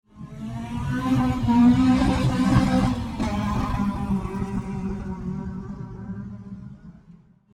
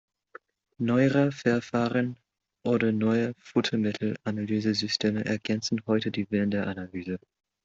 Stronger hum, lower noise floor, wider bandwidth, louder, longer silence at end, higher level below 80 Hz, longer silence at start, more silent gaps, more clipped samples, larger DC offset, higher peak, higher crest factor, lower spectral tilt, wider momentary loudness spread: neither; about the same, -51 dBFS vs -53 dBFS; first, 12 kHz vs 7.8 kHz; first, -23 LUFS vs -27 LUFS; about the same, 0.4 s vs 0.5 s; first, -36 dBFS vs -66 dBFS; second, 0.15 s vs 0.8 s; neither; neither; neither; first, -6 dBFS vs -10 dBFS; about the same, 18 dB vs 18 dB; first, -7.5 dB/octave vs -6 dB/octave; first, 18 LU vs 10 LU